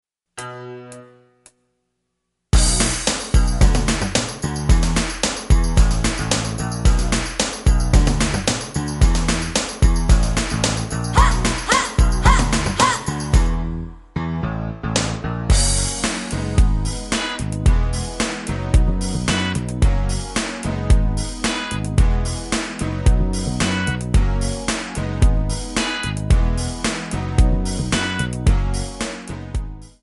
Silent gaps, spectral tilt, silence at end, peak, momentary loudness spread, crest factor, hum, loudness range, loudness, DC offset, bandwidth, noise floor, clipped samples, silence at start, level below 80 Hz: none; -4.5 dB/octave; 0.15 s; 0 dBFS; 8 LU; 18 dB; none; 3 LU; -20 LUFS; under 0.1%; 11.5 kHz; -75 dBFS; under 0.1%; 0.35 s; -20 dBFS